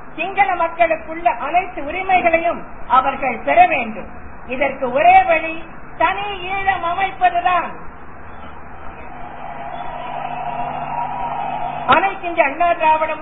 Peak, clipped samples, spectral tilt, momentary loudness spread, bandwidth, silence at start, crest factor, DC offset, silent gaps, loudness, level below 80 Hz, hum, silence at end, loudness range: 0 dBFS; under 0.1%; -8 dB/octave; 21 LU; 4 kHz; 0 s; 18 dB; 2%; none; -17 LUFS; -44 dBFS; none; 0 s; 10 LU